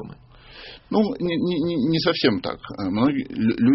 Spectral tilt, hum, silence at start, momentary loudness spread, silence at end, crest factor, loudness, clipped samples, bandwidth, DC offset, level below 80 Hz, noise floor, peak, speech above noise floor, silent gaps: -5 dB/octave; none; 0 s; 19 LU; 0 s; 18 dB; -23 LUFS; under 0.1%; 6 kHz; under 0.1%; -52 dBFS; -46 dBFS; -6 dBFS; 24 dB; none